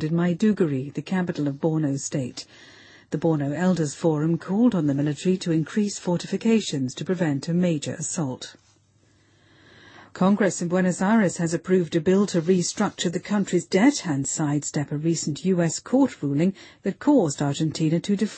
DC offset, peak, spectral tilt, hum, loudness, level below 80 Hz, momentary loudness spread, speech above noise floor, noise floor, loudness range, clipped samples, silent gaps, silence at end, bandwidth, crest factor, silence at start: under 0.1%; -8 dBFS; -6 dB/octave; none; -24 LUFS; -64 dBFS; 7 LU; 38 dB; -61 dBFS; 4 LU; under 0.1%; none; 0 s; 8.8 kHz; 16 dB; 0 s